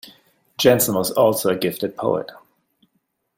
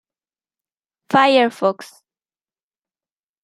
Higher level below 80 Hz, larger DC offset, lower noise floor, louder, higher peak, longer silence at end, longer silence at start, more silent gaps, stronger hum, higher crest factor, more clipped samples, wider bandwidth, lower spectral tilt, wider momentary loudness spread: first, -60 dBFS vs -72 dBFS; neither; second, -71 dBFS vs under -90 dBFS; second, -19 LUFS vs -16 LUFS; about the same, -2 dBFS vs -2 dBFS; second, 1.05 s vs 1.6 s; second, 0.6 s vs 1.1 s; neither; neither; about the same, 20 dB vs 20 dB; neither; first, 16.5 kHz vs 14 kHz; about the same, -4 dB/octave vs -5 dB/octave; about the same, 10 LU vs 9 LU